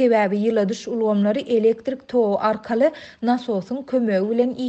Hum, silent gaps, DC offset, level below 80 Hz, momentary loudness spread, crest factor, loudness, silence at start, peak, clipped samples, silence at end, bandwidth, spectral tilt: none; none; under 0.1%; -64 dBFS; 5 LU; 14 dB; -21 LUFS; 0 s; -6 dBFS; under 0.1%; 0 s; 8.2 kHz; -7 dB/octave